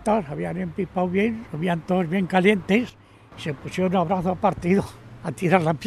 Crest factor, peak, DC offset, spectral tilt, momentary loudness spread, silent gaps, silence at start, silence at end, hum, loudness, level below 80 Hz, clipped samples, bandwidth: 20 dB; -4 dBFS; under 0.1%; -7 dB/octave; 13 LU; none; 0 s; 0 s; none; -23 LUFS; -50 dBFS; under 0.1%; 12.5 kHz